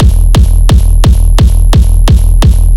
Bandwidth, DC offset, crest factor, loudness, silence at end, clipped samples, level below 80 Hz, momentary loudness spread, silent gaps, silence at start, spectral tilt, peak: 12.5 kHz; under 0.1%; 4 dB; -8 LUFS; 0 s; 0.8%; -4 dBFS; 1 LU; none; 0 s; -6 dB/octave; 0 dBFS